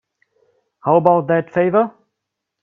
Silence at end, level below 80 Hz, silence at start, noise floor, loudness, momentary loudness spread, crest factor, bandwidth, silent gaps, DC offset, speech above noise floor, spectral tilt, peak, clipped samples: 0.75 s; -62 dBFS; 0.85 s; -79 dBFS; -16 LUFS; 9 LU; 18 dB; 3.8 kHz; none; under 0.1%; 64 dB; -10 dB/octave; 0 dBFS; under 0.1%